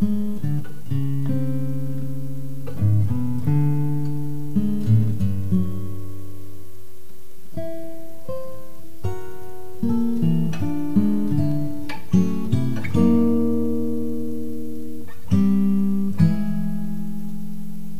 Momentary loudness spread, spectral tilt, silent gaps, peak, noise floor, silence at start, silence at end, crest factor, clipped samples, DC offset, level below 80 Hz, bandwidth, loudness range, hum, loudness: 16 LU; -9 dB/octave; none; -4 dBFS; -48 dBFS; 0 s; 0 s; 18 dB; under 0.1%; 9%; -50 dBFS; 15.5 kHz; 10 LU; none; -23 LUFS